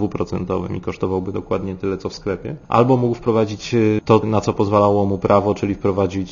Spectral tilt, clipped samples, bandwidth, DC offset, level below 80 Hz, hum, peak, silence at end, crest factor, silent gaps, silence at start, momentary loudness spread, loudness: -7.5 dB/octave; under 0.1%; 7.4 kHz; under 0.1%; -44 dBFS; none; 0 dBFS; 0 s; 18 dB; none; 0 s; 9 LU; -19 LUFS